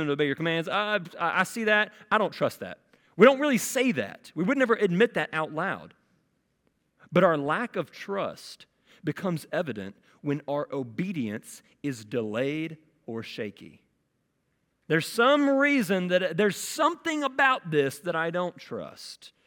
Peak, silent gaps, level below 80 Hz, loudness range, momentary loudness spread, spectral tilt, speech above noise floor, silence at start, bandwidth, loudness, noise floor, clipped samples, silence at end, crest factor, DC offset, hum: -4 dBFS; none; -74 dBFS; 9 LU; 16 LU; -5 dB/octave; 48 dB; 0 s; 17.5 kHz; -26 LUFS; -75 dBFS; under 0.1%; 0.2 s; 24 dB; under 0.1%; none